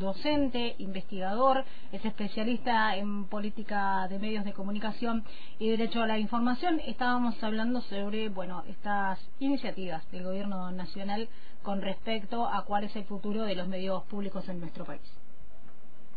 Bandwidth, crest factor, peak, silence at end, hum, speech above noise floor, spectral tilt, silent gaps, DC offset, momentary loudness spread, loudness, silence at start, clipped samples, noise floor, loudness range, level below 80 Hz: 5 kHz; 18 dB; -12 dBFS; 0.1 s; none; 25 dB; -8 dB/octave; none; 4%; 10 LU; -33 LUFS; 0 s; under 0.1%; -58 dBFS; 4 LU; -58 dBFS